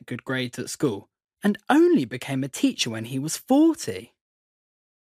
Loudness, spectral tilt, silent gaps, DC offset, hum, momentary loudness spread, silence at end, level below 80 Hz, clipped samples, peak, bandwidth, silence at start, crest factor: -24 LUFS; -5 dB/octave; none; under 0.1%; none; 11 LU; 1.05 s; -72 dBFS; under 0.1%; -4 dBFS; 15.5 kHz; 0.1 s; 20 dB